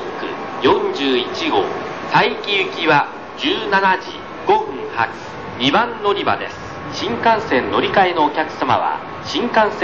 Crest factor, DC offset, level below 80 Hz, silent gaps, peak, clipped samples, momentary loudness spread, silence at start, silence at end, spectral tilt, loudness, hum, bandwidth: 18 dB; 0.4%; -50 dBFS; none; -2 dBFS; under 0.1%; 10 LU; 0 s; 0 s; -4.5 dB/octave; -18 LUFS; none; 7.4 kHz